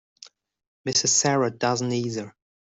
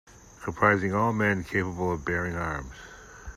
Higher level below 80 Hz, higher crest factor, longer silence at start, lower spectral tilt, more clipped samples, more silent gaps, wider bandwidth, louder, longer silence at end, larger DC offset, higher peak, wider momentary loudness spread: second, -68 dBFS vs -48 dBFS; about the same, 20 dB vs 22 dB; about the same, 0.25 s vs 0.15 s; second, -3 dB/octave vs -6.5 dB/octave; neither; first, 0.67-0.84 s vs none; second, 8.2 kHz vs 14.5 kHz; first, -23 LUFS vs -27 LUFS; first, 0.45 s vs 0 s; neither; about the same, -8 dBFS vs -6 dBFS; second, 15 LU vs 21 LU